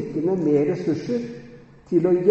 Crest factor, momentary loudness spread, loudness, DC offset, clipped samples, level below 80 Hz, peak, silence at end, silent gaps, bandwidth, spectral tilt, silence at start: 16 dB; 11 LU; -22 LUFS; under 0.1%; under 0.1%; -58 dBFS; -6 dBFS; 0 s; none; 7.6 kHz; -9 dB/octave; 0 s